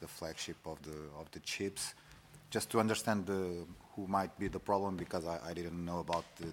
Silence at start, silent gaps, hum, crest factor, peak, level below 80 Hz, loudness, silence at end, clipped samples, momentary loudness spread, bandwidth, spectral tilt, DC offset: 0 s; none; none; 24 dB; -16 dBFS; -62 dBFS; -39 LUFS; 0 s; under 0.1%; 14 LU; 17 kHz; -4.5 dB/octave; under 0.1%